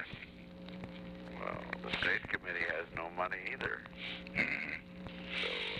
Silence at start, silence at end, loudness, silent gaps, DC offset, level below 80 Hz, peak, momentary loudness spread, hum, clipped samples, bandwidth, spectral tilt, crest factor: 0 s; 0 s; -38 LUFS; none; under 0.1%; -60 dBFS; -18 dBFS; 14 LU; none; under 0.1%; 12.5 kHz; -5 dB/octave; 22 dB